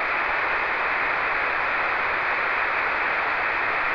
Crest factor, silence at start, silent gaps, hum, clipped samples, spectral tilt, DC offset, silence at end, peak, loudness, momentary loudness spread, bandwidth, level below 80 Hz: 12 dB; 0 s; none; none; under 0.1%; -4 dB/octave; under 0.1%; 0 s; -12 dBFS; -22 LUFS; 0 LU; 5.4 kHz; -52 dBFS